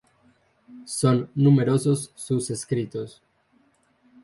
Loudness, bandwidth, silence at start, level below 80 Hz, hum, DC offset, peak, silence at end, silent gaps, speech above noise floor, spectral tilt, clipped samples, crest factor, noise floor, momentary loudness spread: -23 LUFS; 11.5 kHz; 0.7 s; -62 dBFS; none; under 0.1%; -8 dBFS; 1.15 s; none; 41 dB; -6.5 dB/octave; under 0.1%; 18 dB; -64 dBFS; 15 LU